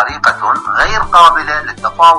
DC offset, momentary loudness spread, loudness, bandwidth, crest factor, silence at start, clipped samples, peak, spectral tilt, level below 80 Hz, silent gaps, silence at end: under 0.1%; 10 LU; -10 LUFS; 11.5 kHz; 10 dB; 0 s; 1%; 0 dBFS; -2.5 dB/octave; -30 dBFS; none; 0 s